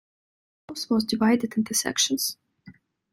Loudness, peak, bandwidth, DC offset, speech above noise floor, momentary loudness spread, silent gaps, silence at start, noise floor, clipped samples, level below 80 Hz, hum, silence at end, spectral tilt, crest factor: -24 LUFS; -8 dBFS; 16 kHz; under 0.1%; 28 dB; 13 LU; none; 0.7 s; -52 dBFS; under 0.1%; -66 dBFS; none; 0.4 s; -2.5 dB/octave; 18 dB